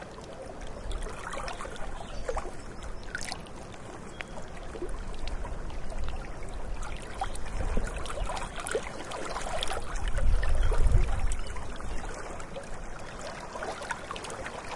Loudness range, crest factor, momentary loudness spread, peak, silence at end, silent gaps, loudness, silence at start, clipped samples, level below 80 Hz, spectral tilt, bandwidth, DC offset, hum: 8 LU; 22 dB; 12 LU; -8 dBFS; 0 s; none; -37 LUFS; 0 s; under 0.1%; -34 dBFS; -4.5 dB/octave; 11.5 kHz; under 0.1%; none